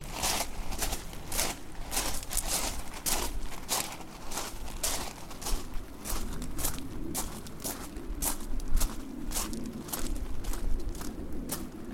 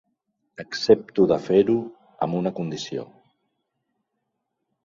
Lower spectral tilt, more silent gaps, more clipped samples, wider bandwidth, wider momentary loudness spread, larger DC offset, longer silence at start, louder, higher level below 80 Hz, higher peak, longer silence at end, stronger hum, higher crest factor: second, -2.5 dB/octave vs -6.5 dB/octave; neither; neither; first, 17 kHz vs 7.4 kHz; second, 9 LU vs 15 LU; neither; second, 0 s vs 0.6 s; second, -35 LUFS vs -23 LUFS; first, -36 dBFS vs -62 dBFS; second, -12 dBFS vs -2 dBFS; second, 0 s vs 1.8 s; neither; about the same, 20 dB vs 22 dB